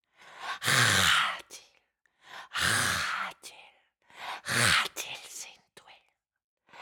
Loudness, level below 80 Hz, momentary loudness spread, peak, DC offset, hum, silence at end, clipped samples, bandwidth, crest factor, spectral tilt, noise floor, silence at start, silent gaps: -26 LUFS; -62 dBFS; 25 LU; -8 dBFS; under 0.1%; none; 0 s; under 0.1%; 19 kHz; 24 dB; -1.5 dB/octave; -71 dBFS; 0.25 s; 6.44-6.57 s